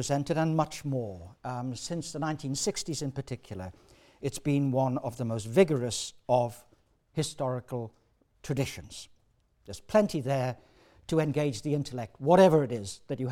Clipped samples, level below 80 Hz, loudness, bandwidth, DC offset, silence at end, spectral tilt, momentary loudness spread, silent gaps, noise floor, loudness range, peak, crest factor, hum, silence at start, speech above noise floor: under 0.1%; -60 dBFS; -30 LUFS; 16.5 kHz; under 0.1%; 0 s; -5.5 dB/octave; 17 LU; none; -68 dBFS; 7 LU; -8 dBFS; 20 dB; none; 0 s; 39 dB